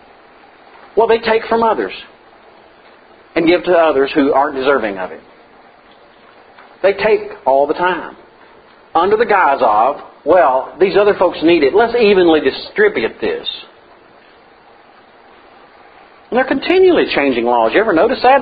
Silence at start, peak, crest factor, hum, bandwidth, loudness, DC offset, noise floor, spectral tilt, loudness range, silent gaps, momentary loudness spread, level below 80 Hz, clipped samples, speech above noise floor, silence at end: 0.95 s; 0 dBFS; 14 dB; none; 5 kHz; -13 LUFS; under 0.1%; -45 dBFS; -8.5 dB/octave; 7 LU; none; 9 LU; -50 dBFS; under 0.1%; 32 dB; 0 s